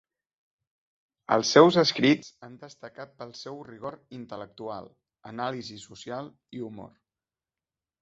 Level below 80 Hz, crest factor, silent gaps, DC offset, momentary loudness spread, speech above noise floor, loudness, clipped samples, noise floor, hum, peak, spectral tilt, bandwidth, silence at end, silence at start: -70 dBFS; 26 dB; none; under 0.1%; 26 LU; over 63 dB; -23 LUFS; under 0.1%; under -90 dBFS; none; -4 dBFS; -4.5 dB/octave; 8 kHz; 1.15 s; 1.3 s